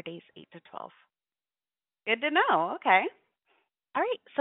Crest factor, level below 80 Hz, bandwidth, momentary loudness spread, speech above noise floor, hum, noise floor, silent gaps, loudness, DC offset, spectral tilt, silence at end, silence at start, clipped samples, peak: 24 dB; -84 dBFS; 4 kHz; 21 LU; over 62 dB; none; under -90 dBFS; none; -27 LUFS; under 0.1%; -0.5 dB/octave; 0 s; 0.05 s; under 0.1%; -8 dBFS